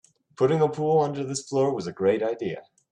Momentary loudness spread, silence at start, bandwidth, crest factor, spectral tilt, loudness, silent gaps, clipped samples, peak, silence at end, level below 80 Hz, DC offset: 9 LU; 0.4 s; 10.5 kHz; 16 dB; -6 dB/octave; -25 LUFS; none; under 0.1%; -10 dBFS; 0.3 s; -68 dBFS; under 0.1%